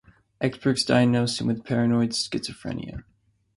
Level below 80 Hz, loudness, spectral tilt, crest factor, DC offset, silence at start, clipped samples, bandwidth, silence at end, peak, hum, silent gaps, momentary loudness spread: -54 dBFS; -24 LUFS; -5.5 dB/octave; 18 dB; under 0.1%; 0.4 s; under 0.1%; 11.5 kHz; 0.55 s; -8 dBFS; none; none; 14 LU